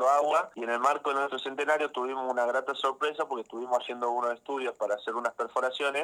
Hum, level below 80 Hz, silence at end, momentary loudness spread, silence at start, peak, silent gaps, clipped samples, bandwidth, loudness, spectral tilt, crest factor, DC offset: none; -84 dBFS; 0 s; 6 LU; 0 s; -10 dBFS; none; under 0.1%; 15 kHz; -30 LUFS; -2 dB/octave; 18 dB; under 0.1%